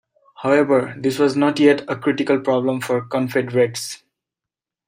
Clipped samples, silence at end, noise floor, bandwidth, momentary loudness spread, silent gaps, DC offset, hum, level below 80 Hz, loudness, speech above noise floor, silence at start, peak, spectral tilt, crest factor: under 0.1%; 0.9 s; -87 dBFS; 16 kHz; 8 LU; none; under 0.1%; none; -66 dBFS; -19 LUFS; 69 dB; 0.4 s; -2 dBFS; -5.5 dB/octave; 16 dB